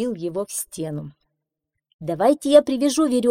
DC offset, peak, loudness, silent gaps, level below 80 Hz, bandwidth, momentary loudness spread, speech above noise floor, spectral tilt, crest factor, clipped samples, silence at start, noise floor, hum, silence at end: under 0.1%; -2 dBFS; -20 LUFS; 1.94-1.99 s; -60 dBFS; 16.5 kHz; 17 LU; 61 dB; -5 dB/octave; 20 dB; under 0.1%; 0 s; -81 dBFS; none; 0 s